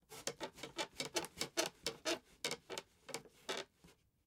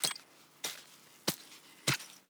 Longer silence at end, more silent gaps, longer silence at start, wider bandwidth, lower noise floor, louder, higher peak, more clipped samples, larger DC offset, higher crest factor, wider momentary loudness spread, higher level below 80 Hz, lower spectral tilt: first, 0.35 s vs 0.1 s; neither; about the same, 0.1 s vs 0 s; second, 17 kHz vs over 20 kHz; first, -69 dBFS vs -57 dBFS; second, -44 LUFS vs -37 LUFS; second, -18 dBFS vs -10 dBFS; neither; neither; about the same, 28 dB vs 30 dB; second, 10 LU vs 17 LU; about the same, -76 dBFS vs -80 dBFS; about the same, -1.5 dB/octave vs -2 dB/octave